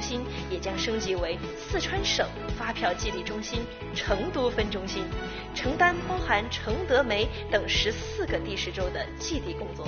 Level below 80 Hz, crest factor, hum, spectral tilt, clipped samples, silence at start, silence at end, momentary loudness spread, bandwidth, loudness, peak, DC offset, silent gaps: -40 dBFS; 20 dB; none; -3 dB/octave; under 0.1%; 0 s; 0 s; 9 LU; 6.8 kHz; -29 LUFS; -8 dBFS; under 0.1%; none